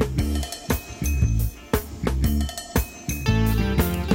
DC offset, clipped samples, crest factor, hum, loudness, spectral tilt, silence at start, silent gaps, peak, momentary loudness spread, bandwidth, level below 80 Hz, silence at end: under 0.1%; under 0.1%; 16 dB; none; -25 LUFS; -5.5 dB/octave; 0 s; none; -6 dBFS; 6 LU; 16.5 kHz; -28 dBFS; 0 s